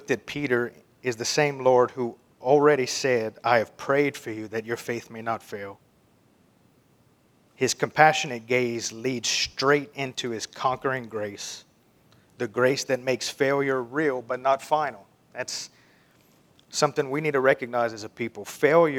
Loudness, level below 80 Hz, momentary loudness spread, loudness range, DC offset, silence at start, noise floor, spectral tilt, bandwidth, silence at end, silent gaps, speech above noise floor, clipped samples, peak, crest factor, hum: -25 LUFS; -68 dBFS; 13 LU; 6 LU; under 0.1%; 0 s; -61 dBFS; -4 dB/octave; 18 kHz; 0 s; none; 37 dB; under 0.1%; 0 dBFS; 26 dB; none